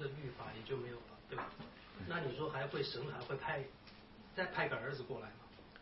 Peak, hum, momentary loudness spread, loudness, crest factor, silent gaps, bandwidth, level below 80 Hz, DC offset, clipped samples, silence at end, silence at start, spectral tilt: -24 dBFS; none; 15 LU; -43 LUFS; 20 dB; none; 5.6 kHz; -68 dBFS; under 0.1%; under 0.1%; 0 s; 0 s; -3.5 dB/octave